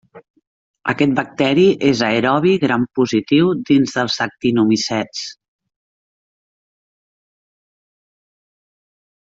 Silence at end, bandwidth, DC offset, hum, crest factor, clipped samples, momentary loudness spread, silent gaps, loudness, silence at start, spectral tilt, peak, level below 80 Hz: 3.9 s; 7.8 kHz; under 0.1%; none; 16 dB; under 0.1%; 9 LU; 0.30-0.34 s, 0.47-0.74 s; -16 LUFS; 0.15 s; -5.5 dB/octave; -2 dBFS; -58 dBFS